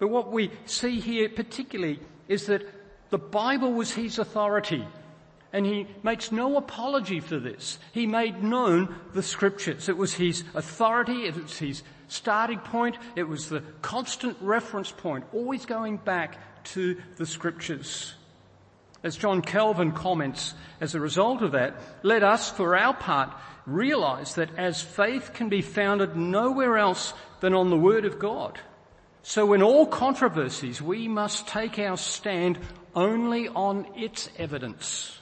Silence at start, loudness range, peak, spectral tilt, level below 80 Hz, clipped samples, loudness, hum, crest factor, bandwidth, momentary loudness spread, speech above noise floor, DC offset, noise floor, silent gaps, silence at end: 0 s; 6 LU; -6 dBFS; -4.5 dB/octave; -60 dBFS; under 0.1%; -27 LUFS; none; 20 dB; 8.8 kHz; 12 LU; 30 dB; under 0.1%; -56 dBFS; none; 0 s